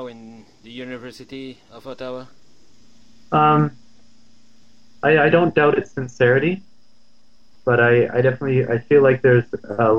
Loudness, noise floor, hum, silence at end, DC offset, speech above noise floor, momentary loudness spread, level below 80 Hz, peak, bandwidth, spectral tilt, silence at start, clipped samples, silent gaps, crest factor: -17 LUFS; -60 dBFS; none; 0 s; 0.8%; 42 dB; 21 LU; -60 dBFS; -4 dBFS; 7.4 kHz; -8 dB/octave; 0 s; under 0.1%; none; 16 dB